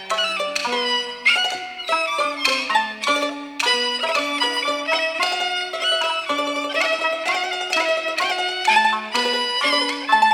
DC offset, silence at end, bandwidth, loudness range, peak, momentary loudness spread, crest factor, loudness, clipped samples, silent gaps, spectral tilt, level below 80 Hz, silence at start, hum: under 0.1%; 0 s; 18.5 kHz; 1 LU; -4 dBFS; 5 LU; 18 dB; -20 LUFS; under 0.1%; none; 0 dB/octave; -66 dBFS; 0 s; none